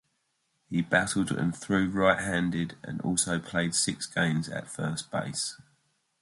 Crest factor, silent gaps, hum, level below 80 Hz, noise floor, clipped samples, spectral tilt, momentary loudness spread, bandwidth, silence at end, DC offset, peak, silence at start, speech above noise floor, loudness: 22 dB; none; none; -56 dBFS; -76 dBFS; under 0.1%; -4 dB/octave; 9 LU; 11.5 kHz; 0.65 s; under 0.1%; -8 dBFS; 0.7 s; 47 dB; -29 LUFS